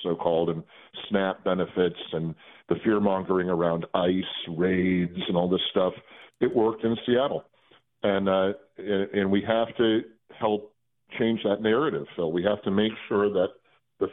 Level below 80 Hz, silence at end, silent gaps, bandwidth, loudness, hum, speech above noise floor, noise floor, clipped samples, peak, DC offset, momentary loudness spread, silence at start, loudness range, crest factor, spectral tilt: -62 dBFS; 0 s; none; 4.1 kHz; -26 LUFS; none; 36 dB; -62 dBFS; under 0.1%; -8 dBFS; under 0.1%; 8 LU; 0 s; 1 LU; 18 dB; -10 dB/octave